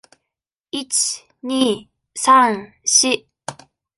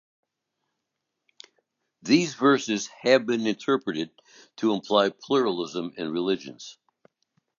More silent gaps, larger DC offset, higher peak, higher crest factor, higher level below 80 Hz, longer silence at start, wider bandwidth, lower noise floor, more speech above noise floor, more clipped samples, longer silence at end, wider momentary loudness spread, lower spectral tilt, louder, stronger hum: neither; neither; about the same, -2 dBFS vs -4 dBFS; about the same, 18 dB vs 22 dB; first, -64 dBFS vs -74 dBFS; second, 0.75 s vs 2.05 s; first, 12 kHz vs 7.4 kHz; about the same, -83 dBFS vs -82 dBFS; first, 65 dB vs 58 dB; neither; second, 0.45 s vs 0.85 s; first, 21 LU vs 13 LU; second, -1 dB/octave vs -4.5 dB/octave; first, -17 LUFS vs -25 LUFS; neither